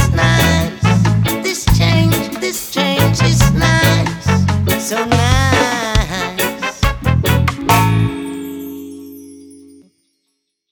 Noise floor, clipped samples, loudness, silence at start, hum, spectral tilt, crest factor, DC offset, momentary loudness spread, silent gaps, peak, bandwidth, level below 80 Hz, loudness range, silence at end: -70 dBFS; under 0.1%; -14 LUFS; 0 s; none; -5 dB/octave; 14 dB; under 0.1%; 12 LU; none; 0 dBFS; 19.5 kHz; -26 dBFS; 4 LU; 1.15 s